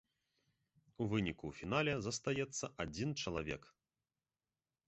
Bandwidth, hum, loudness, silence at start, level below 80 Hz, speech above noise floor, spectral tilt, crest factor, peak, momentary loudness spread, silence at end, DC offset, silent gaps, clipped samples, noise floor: 8 kHz; none; -40 LUFS; 1 s; -62 dBFS; over 50 dB; -4.5 dB/octave; 20 dB; -22 dBFS; 8 LU; 1.2 s; under 0.1%; none; under 0.1%; under -90 dBFS